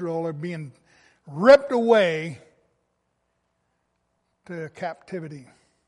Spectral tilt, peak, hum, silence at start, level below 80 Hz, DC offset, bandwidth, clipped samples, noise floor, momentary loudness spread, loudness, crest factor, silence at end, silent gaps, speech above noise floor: -6 dB/octave; -4 dBFS; none; 0 s; -64 dBFS; under 0.1%; 10.5 kHz; under 0.1%; -74 dBFS; 24 LU; -20 LUFS; 22 dB; 0.45 s; none; 52 dB